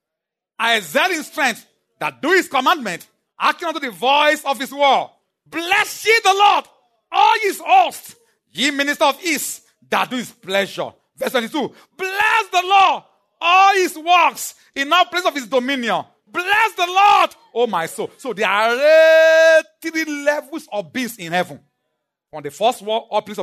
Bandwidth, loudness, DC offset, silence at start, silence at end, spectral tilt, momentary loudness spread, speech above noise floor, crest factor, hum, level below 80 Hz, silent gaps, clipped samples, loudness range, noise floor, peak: 13.5 kHz; -17 LUFS; under 0.1%; 0.6 s; 0 s; -2 dB/octave; 15 LU; 66 dB; 16 dB; none; -70 dBFS; none; under 0.1%; 6 LU; -83 dBFS; -2 dBFS